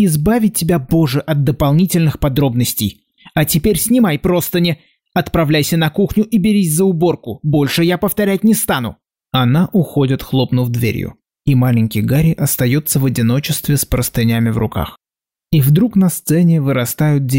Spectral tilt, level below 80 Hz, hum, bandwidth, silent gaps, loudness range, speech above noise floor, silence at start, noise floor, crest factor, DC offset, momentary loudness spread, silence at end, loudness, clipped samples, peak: -6 dB/octave; -36 dBFS; none; 16.5 kHz; none; 1 LU; 76 dB; 0 s; -89 dBFS; 10 dB; 0.2%; 6 LU; 0 s; -15 LUFS; under 0.1%; -4 dBFS